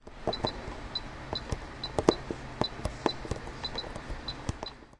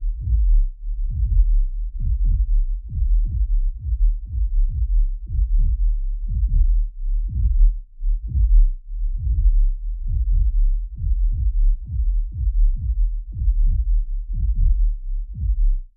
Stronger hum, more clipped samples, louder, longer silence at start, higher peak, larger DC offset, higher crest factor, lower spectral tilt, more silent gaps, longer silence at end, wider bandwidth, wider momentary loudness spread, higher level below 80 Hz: neither; neither; second, -35 LUFS vs -24 LUFS; about the same, 0 s vs 0 s; first, -2 dBFS vs -6 dBFS; neither; first, 32 dB vs 12 dB; second, -5 dB/octave vs -15 dB/octave; neither; about the same, 0 s vs 0.1 s; first, 11.5 kHz vs 0.4 kHz; first, 11 LU vs 8 LU; second, -44 dBFS vs -18 dBFS